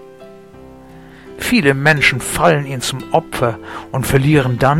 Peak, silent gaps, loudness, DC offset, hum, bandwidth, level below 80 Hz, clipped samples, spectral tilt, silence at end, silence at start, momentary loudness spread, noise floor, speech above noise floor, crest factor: 0 dBFS; none; -15 LUFS; 0.2%; none; 16.5 kHz; -38 dBFS; under 0.1%; -5 dB/octave; 0 s; 0 s; 10 LU; -39 dBFS; 24 dB; 16 dB